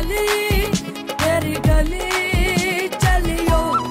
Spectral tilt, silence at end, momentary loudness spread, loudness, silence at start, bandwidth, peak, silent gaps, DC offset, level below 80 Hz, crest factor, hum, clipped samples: -4.5 dB/octave; 0 s; 3 LU; -19 LUFS; 0 s; 16.5 kHz; -6 dBFS; none; under 0.1%; -24 dBFS; 12 dB; none; under 0.1%